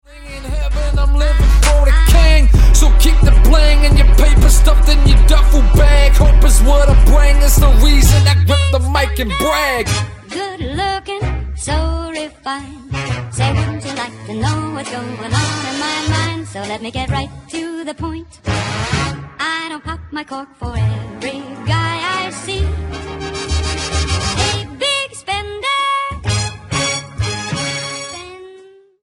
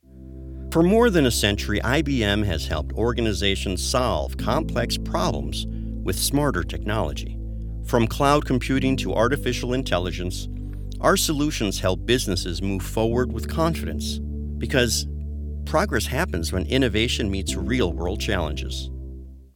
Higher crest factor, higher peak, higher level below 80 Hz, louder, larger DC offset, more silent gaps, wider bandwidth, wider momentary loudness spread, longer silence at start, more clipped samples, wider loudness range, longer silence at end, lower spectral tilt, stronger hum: second, 12 dB vs 20 dB; about the same, 0 dBFS vs -2 dBFS; first, -14 dBFS vs -30 dBFS; first, -15 LUFS vs -23 LUFS; neither; neither; second, 16 kHz vs 18.5 kHz; about the same, 14 LU vs 12 LU; about the same, 0.15 s vs 0.15 s; neither; first, 10 LU vs 3 LU; first, 0.55 s vs 0.1 s; about the same, -4.5 dB/octave vs -4.5 dB/octave; neither